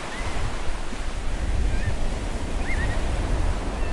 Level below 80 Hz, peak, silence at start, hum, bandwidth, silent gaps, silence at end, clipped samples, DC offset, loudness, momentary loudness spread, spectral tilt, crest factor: -26 dBFS; -12 dBFS; 0 s; none; 11.5 kHz; none; 0 s; under 0.1%; under 0.1%; -29 LUFS; 6 LU; -5 dB/octave; 12 dB